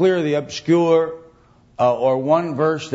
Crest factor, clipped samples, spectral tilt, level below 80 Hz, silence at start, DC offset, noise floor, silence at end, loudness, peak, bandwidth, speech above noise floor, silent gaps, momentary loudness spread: 14 dB; under 0.1%; -6.5 dB/octave; -60 dBFS; 0 s; under 0.1%; -52 dBFS; 0 s; -19 LUFS; -4 dBFS; 8 kHz; 34 dB; none; 7 LU